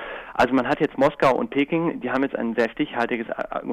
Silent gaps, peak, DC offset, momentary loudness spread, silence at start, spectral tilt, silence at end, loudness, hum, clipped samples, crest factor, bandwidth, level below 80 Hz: none; -10 dBFS; under 0.1%; 7 LU; 0 s; -6.5 dB/octave; 0 s; -23 LUFS; none; under 0.1%; 14 dB; 12 kHz; -54 dBFS